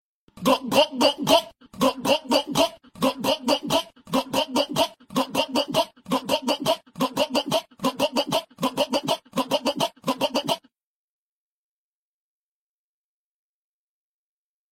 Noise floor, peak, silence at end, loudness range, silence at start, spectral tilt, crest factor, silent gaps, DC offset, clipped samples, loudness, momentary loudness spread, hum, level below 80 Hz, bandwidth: under -90 dBFS; -4 dBFS; 4.15 s; 7 LU; 0.35 s; -3.5 dB/octave; 22 dB; none; under 0.1%; under 0.1%; -24 LUFS; 7 LU; none; -62 dBFS; 16.5 kHz